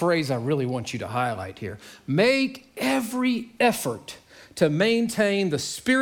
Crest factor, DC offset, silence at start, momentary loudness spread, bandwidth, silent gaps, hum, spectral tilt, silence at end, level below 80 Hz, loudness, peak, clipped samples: 18 dB; under 0.1%; 0 s; 16 LU; 19 kHz; none; none; -5 dB/octave; 0 s; -64 dBFS; -24 LUFS; -6 dBFS; under 0.1%